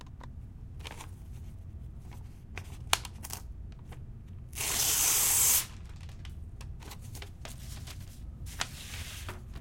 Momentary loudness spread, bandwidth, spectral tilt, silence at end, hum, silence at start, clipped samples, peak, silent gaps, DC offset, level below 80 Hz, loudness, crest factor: 23 LU; 16.5 kHz; -1 dB/octave; 0 s; none; 0 s; under 0.1%; -2 dBFS; none; under 0.1%; -48 dBFS; -28 LUFS; 34 dB